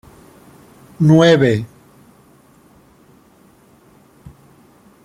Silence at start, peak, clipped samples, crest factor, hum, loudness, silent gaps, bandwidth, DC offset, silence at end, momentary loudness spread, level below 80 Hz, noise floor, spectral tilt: 1 s; -2 dBFS; under 0.1%; 18 dB; none; -13 LUFS; none; 11.5 kHz; under 0.1%; 3.4 s; 14 LU; -54 dBFS; -50 dBFS; -7 dB/octave